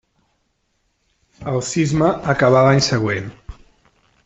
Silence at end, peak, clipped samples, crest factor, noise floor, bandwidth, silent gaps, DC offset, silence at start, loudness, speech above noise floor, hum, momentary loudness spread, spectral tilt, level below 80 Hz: 0.75 s; -2 dBFS; under 0.1%; 16 dB; -68 dBFS; 8.4 kHz; none; under 0.1%; 1.4 s; -17 LUFS; 51 dB; none; 12 LU; -5.5 dB/octave; -46 dBFS